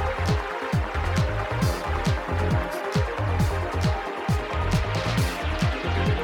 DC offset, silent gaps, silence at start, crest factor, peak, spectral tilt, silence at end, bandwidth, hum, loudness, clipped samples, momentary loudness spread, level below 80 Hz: under 0.1%; none; 0 s; 14 dB; -10 dBFS; -6 dB/octave; 0 s; 17.5 kHz; none; -26 LUFS; under 0.1%; 2 LU; -32 dBFS